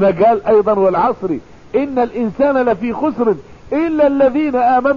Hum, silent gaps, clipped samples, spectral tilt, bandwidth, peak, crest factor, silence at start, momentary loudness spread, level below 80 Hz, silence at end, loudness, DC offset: none; none; under 0.1%; -8.5 dB/octave; 7 kHz; -4 dBFS; 10 dB; 0 s; 9 LU; -46 dBFS; 0 s; -15 LUFS; 0.6%